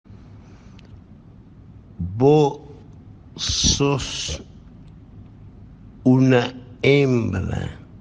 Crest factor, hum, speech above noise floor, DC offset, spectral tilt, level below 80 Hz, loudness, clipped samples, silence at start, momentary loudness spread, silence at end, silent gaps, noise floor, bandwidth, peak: 20 dB; none; 27 dB; under 0.1%; -5 dB/octave; -40 dBFS; -19 LUFS; under 0.1%; 0.1 s; 16 LU; 0.05 s; none; -45 dBFS; 9.8 kHz; -2 dBFS